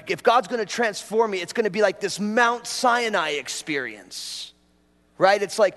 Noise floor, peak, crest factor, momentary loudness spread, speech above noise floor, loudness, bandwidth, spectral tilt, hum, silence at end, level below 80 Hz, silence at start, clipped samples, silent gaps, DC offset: -61 dBFS; -4 dBFS; 20 dB; 12 LU; 39 dB; -23 LUFS; 12 kHz; -3 dB/octave; none; 0 s; -68 dBFS; 0.05 s; under 0.1%; none; under 0.1%